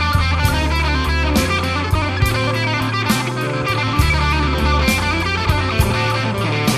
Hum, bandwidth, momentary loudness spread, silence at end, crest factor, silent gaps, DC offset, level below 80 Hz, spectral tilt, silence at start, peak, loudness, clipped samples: none; 14 kHz; 3 LU; 0 s; 16 dB; none; under 0.1%; -24 dBFS; -5 dB/octave; 0 s; -2 dBFS; -17 LUFS; under 0.1%